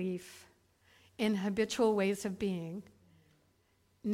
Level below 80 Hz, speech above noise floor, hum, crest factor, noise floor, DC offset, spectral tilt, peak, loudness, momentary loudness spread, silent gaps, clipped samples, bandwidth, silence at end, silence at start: -68 dBFS; 39 dB; none; 18 dB; -72 dBFS; under 0.1%; -5.5 dB/octave; -18 dBFS; -34 LUFS; 17 LU; none; under 0.1%; 16 kHz; 0 s; 0 s